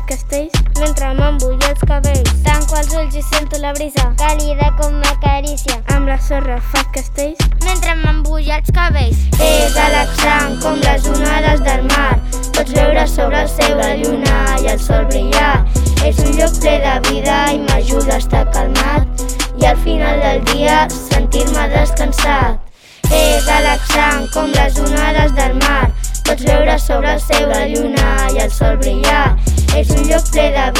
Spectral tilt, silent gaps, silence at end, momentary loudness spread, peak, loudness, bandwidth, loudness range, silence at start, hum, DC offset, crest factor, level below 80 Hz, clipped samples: -4.5 dB/octave; none; 0 s; 5 LU; 0 dBFS; -14 LUFS; 16 kHz; 3 LU; 0 s; none; under 0.1%; 12 dB; -14 dBFS; under 0.1%